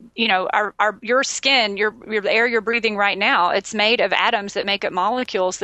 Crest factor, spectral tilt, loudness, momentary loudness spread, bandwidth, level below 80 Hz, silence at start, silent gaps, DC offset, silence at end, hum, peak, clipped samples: 16 dB; -2 dB/octave; -18 LUFS; 5 LU; 8.6 kHz; -62 dBFS; 0 s; none; under 0.1%; 0 s; none; -2 dBFS; under 0.1%